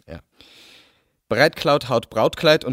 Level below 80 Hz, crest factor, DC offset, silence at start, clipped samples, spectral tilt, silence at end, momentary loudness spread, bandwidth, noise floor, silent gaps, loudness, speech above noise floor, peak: -54 dBFS; 20 dB; under 0.1%; 0.1 s; under 0.1%; -5 dB/octave; 0 s; 8 LU; 16 kHz; -59 dBFS; none; -19 LUFS; 41 dB; 0 dBFS